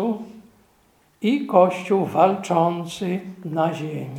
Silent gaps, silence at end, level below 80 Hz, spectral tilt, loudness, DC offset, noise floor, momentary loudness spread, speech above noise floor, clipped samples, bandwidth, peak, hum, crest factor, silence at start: none; 0 s; -68 dBFS; -7 dB/octave; -22 LUFS; under 0.1%; -60 dBFS; 12 LU; 39 dB; under 0.1%; 16.5 kHz; -2 dBFS; none; 20 dB; 0 s